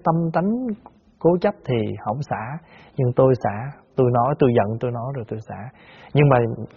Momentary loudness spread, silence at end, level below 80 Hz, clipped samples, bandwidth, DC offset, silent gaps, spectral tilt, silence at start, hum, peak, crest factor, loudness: 16 LU; 0.1 s; -52 dBFS; under 0.1%; 6.8 kHz; under 0.1%; none; -7.5 dB/octave; 0.05 s; none; -2 dBFS; 20 dB; -21 LUFS